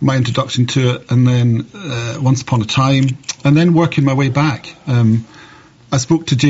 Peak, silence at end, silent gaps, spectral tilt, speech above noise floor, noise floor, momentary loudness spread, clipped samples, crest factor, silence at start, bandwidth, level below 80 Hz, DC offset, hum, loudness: -2 dBFS; 0 s; none; -6 dB/octave; 28 dB; -42 dBFS; 7 LU; under 0.1%; 12 dB; 0 s; 8 kHz; -48 dBFS; under 0.1%; none; -15 LUFS